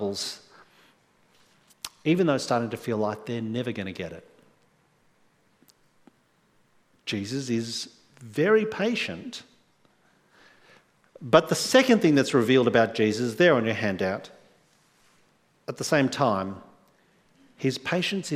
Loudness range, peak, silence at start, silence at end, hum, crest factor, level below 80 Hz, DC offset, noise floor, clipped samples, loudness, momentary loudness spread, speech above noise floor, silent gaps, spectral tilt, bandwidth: 14 LU; -2 dBFS; 0 s; 0 s; none; 24 dB; -68 dBFS; under 0.1%; -65 dBFS; under 0.1%; -25 LUFS; 18 LU; 41 dB; none; -5 dB/octave; 16 kHz